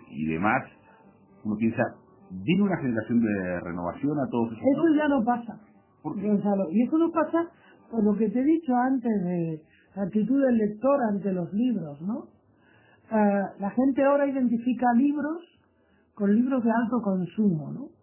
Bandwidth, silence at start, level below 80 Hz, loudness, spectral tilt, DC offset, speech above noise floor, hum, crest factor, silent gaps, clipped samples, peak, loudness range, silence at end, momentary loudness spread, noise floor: 3.2 kHz; 0.1 s; -60 dBFS; -26 LUFS; -7.5 dB/octave; under 0.1%; 39 dB; none; 18 dB; none; under 0.1%; -8 dBFS; 2 LU; 0.15 s; 11 LU; -64 dBFS